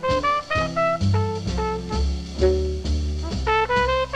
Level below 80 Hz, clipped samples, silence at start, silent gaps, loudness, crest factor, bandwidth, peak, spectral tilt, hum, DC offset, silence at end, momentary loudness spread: -28 dBFS; under 0.1%; 0 s; none; -23 LUFS; 14 dB; 9.6 kHz; -8 dBFS; -6 dB/octave; none; under 0.1%; 0 s; 6 LU